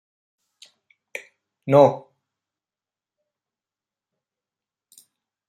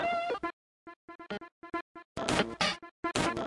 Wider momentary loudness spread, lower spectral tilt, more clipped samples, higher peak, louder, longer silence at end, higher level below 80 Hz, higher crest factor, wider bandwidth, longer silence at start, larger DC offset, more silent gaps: about the same, 22 LU vs 20 LU; first, -7.5 dB/octave vs -3.5 dB/octave; neither; first, -2 dBFS vs -14 dBFS; first, -17 LUFS vs -34 LUFS; first, 3.5 s vs 0 s; second, -72 dBFS vs -58 dBFS; about the same, 24 dB vs 22 dB; first, 13 kHz vs 11.5 kHz; first, 1.15 s vs 0 s; neither; second, none vs 0.53-0.86 s, 0.96-1.08 s, 1.15-1.19 s, 1.52-1.62 s, 1.81-1.95 s, 2.05-2.15 s, 2.91-3.03 s